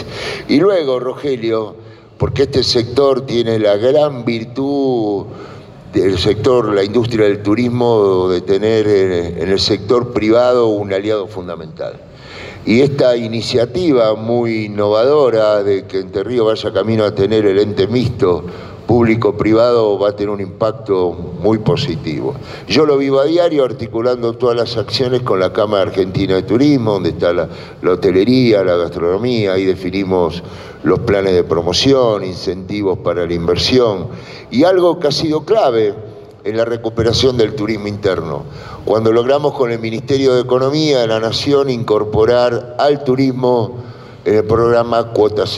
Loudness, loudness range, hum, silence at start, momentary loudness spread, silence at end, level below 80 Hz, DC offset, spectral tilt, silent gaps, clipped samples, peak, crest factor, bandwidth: -14 LUFS; 2 LU; none; 0 s; 9 LU; 0 s; -46 dBFS; under 0.1%; -6.5 dB/octave; none; under 0.1%; -2 dBFS; 12 dB; 12 kHz